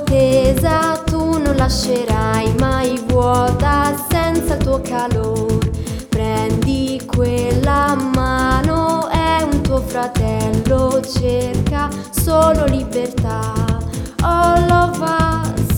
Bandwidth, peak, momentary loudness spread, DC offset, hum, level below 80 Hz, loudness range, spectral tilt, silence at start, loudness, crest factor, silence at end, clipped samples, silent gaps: 20 kHz; 0 dBFS; 6 LU; under 0.1%; none; -26 dBFS; 2 LU; -6 dB/octave; 0 s; -16 LUFS; 16 dB; 0 s; under 0.1%; none